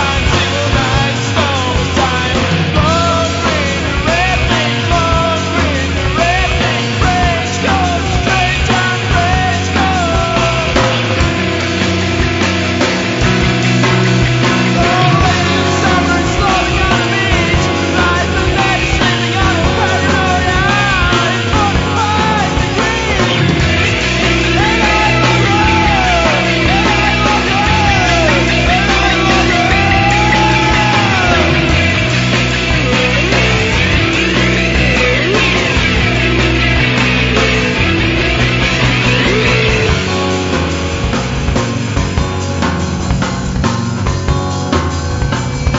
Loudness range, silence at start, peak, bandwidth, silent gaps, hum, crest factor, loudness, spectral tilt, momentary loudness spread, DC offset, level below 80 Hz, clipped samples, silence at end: 3 LU; 0 s; 0 dBFS; 8 kHz; none; none; 12 dB; -12 LUFS; -4.5 dB/octave; 5 LU; under 0.1%; -22 dBFS; under 0.1%; 0 s